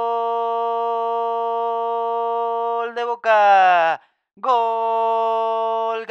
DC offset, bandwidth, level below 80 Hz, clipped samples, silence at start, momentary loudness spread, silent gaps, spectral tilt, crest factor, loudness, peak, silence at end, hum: under 0.1%; 7.6 kHz; under -90 dBFS; under 0.1%; 0 s; 9 LU; none; -3 dB/octave; 16 dB; -20 LUFS; -4 dBFS; 0 s; none